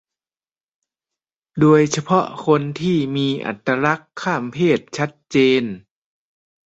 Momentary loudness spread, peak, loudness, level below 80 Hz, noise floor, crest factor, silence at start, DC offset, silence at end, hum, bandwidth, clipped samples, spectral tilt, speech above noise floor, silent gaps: 10 LU; -2 dBFS; -19 LUFS; -60 dBFS; under -90 dBFS; 18 dB; 1.55 s; under 0.1%; 0.9 s; none; 8.2 kHz; under 0.1%; -6 dB/octave; over 72 dB; none